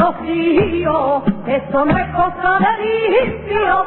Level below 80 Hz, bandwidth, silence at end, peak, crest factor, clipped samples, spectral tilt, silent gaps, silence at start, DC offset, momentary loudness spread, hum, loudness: -38 dBFS; 4.2 kHz; 0 s; -2 dBFS; 12 dB; under 0.1%; -11.5 dB/octave; none; 0 s; under 0.1%; 4 LU; none; -16 LUFS